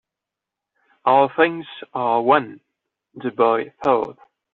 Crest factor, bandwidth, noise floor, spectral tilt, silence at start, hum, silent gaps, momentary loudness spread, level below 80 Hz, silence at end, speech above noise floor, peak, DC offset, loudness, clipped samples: 18 dB; 6.6 kHz; -85 dBFS; -3 dB/octave; 1.05 s; none; none; 14 LU; -66 dBFS; 0.4 s; 66 dB; -2 dBFS; under 0.1%; -19 LUFS; under 0.1%